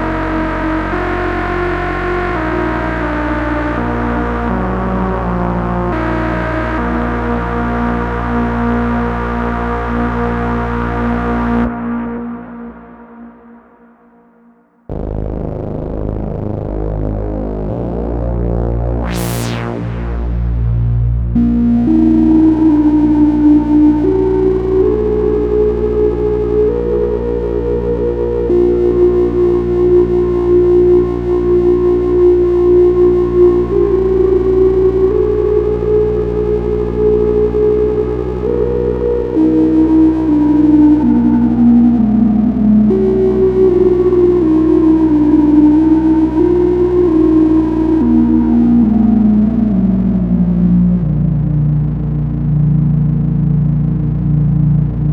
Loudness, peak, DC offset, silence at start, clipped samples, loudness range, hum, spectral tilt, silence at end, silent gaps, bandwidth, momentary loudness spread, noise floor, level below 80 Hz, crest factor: -13 LUFS; 0 dBFS; under 0.1%; 0 s; under 0.1%; 9 LU; none; -9.5 dB/octave; 0 s; none; 13.5 kHz; 9 LU; -48 dBFS; -24 dBFS; 12 dB